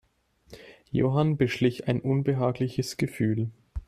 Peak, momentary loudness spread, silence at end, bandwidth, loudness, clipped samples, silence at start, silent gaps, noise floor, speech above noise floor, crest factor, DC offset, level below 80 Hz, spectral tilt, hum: -10 dBFS; 6 LU; 0.05 s; 14.5 kHz; -27 LUFS; under 0.1%; 0.5 s; none; -63 dBFS; 38 dB; 18 dB; under 0.1%; -50 dBFS; -7 dB/octave; none